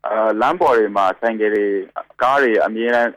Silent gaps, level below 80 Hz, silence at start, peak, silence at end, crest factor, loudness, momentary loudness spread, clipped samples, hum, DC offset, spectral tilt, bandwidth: none; -58 dBFS; 0.05 s; -6 dBFS; 0.05 s; 10 dB; -17 LUFS; 6 LU; under 0.1%; none; under 0.1%; -5.5 dB/octave; 11.5 kHz